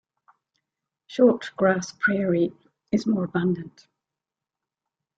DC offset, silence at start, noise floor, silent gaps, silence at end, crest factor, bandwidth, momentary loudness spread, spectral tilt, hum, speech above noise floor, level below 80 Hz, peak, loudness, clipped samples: under 0.1%; 1.1 s; -88 dBFS; none; 1.5 s; 20 dB; 7.8 kHz; 9 LU; -6.5 dB/octave; none; 65 dB; -64 dBFS; -6 dBFS; -24 LUFS; under 0.1%